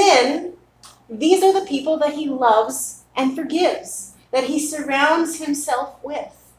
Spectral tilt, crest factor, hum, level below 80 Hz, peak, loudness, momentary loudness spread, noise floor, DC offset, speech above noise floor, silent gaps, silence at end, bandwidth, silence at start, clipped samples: -2 dB/octave; 18 dB; none; -62 dBFS; 0 dBFS; -20 LUFS; 14 LU; -49 dBFS; under 0.1%; 29 dB; none; 0.3 s; 16 kHz; 0 s; under 0.1%